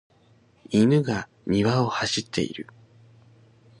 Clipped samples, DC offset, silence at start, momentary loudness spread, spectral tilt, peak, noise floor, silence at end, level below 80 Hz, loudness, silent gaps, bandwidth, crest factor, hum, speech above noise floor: under 0.1%; under 0.1%; 0.7 s; 11 LU; -5.5 dB/octave; -8 dBFS; -59 dBFS; 1.2 s; -56 dBFS; -24 LUFS; none; 11 kHz; 18 dB; none; 36 dB